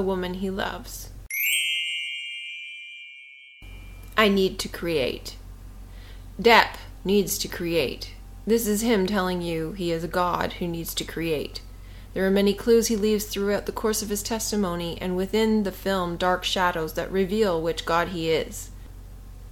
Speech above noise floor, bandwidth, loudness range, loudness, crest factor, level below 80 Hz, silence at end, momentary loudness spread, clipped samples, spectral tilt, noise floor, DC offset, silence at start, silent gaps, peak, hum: 22 dB; 17.5 kHz; 4 LU; -24 LUFS; 22 dB; -42 dBFS; 0 s; 23 LU; under 0.1%; -4 dB/octave; -47 dBFS; under 0.1%; 0 s; none; -2 dBFS; none